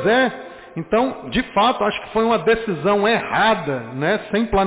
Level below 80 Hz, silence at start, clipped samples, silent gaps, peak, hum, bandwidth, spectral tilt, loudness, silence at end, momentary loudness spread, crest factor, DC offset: -42 dBFS; 0 s; under 0.1%; none; -8 dBFS; none; 4 kHz; -9.5 dB/octave; -19 LUFS; 0 s; 6 LU; 12 dB; under 0.1%